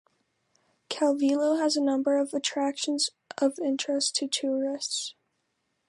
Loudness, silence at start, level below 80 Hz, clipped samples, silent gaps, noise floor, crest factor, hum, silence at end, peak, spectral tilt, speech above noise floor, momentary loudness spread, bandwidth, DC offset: -27 LUFS; 0.9 s; -84 dBFS; under 0.1%; none; -77 dBFS; 16 dB; none; 0.75 s; -12 dBFS; -1.5 dB/octave; 50 dB; 5 LU; 11.5 kHz; under 0.1%